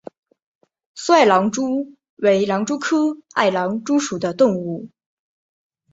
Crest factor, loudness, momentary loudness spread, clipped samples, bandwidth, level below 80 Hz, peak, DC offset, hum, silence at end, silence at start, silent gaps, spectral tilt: 18 dB; -19 LUFS; 11 LU; under 0.1%; 8 kHz; -64 dBFS; -2 dBFS; under 0.1%; none; 1.05 s; 0.95 s; 2.10-2.17 s; -4.5 dB/octave